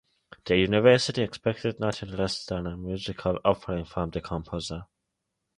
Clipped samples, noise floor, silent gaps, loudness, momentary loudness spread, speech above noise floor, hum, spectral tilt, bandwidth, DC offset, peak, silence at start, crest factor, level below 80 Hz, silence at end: under 0.1%; -82 dBFS; none; -27 LUFS; 14 LU; 55 dB; none; -5.5 dB/octave; 11 kHz; under 0.1%; -6 dBFS; 0.45 s; 22 dB; -48 dBFS; 0.75 s